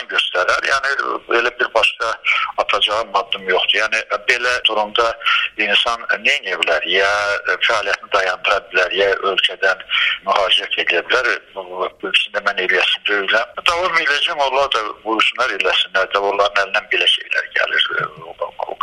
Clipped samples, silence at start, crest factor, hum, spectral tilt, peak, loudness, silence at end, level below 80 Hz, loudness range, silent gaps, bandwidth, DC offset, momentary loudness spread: under 0.1%; 0 s; 18 dB; none; -1 dB/octave; 0 dBFS; -16 LUFS; 0.1 s; -52 dBFS; 1 LU; none; 13.5 kHz; under 0.1%; 5 LU